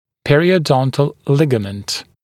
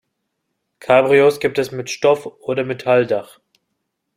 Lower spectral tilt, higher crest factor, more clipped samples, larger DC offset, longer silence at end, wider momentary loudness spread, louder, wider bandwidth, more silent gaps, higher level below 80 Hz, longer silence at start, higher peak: about the same, -6 dB/octave vs -5 dB/octave; about the same, 16 dB vs 18 dB; neither; neither; second, 0.2 s vs 0.9 s; about the same, 10 LU vs 11 LU; about the same, -16 LUFS vs -17 LUFS; second, 14 kHz vs 15.5 kHz; neither; first, -50 dBFS vs -62 dBFS; second, 0.25 s vs 0.85 s; about the same, 0 dBFS vs 0 dBFS